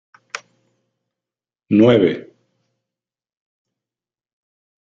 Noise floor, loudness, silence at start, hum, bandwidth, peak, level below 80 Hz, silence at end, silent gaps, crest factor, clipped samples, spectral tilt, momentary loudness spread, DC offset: under -90 dBFS; -15 LUFS; 0.35 s; none; 7.6 kHz; -2 dBFS; -62 dBFS; 2.65 s; none; 20 dB; under 0.1%; -7.5 dB/octave; 21 LU; under 0.1%